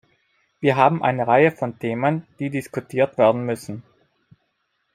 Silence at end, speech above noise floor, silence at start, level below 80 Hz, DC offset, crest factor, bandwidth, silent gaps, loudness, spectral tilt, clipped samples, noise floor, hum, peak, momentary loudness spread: 1.15 s; 51 dB; 0.6 s; -64 dBFS; under 0.1%; 20 dB; 15.5 kHz; none; -21 LUFS; -7 dB/octave; under 0.1%; -72 dBFS; none; -2 dBFS; 11 LU